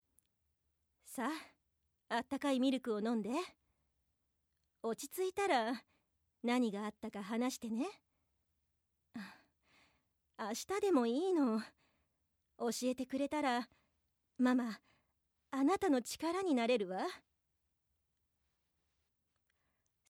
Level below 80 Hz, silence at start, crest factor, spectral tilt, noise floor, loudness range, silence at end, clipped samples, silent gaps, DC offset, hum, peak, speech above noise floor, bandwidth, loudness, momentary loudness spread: -80 dBFS; 1.05 s; 18 dB; -4 dB/octave; -82 dBFS; 6 LU; 2.9 s; under 0.1%; none; under 0.1%; none; -22 dBFS; 46 dB; 16.5 kHz; -38 LUFS; 13 LU